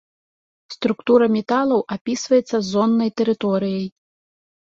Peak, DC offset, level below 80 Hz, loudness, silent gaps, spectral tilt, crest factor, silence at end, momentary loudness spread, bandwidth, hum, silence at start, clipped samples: -4 dBFS; under 0.1%; -62 dBFS; -19 LUFS; 2.01-2.05 s; -5.5 dB/octave; 16 dB; 0.8 s; 9 LU; 7.8 kHz; none; 0.7 s; under 0.1%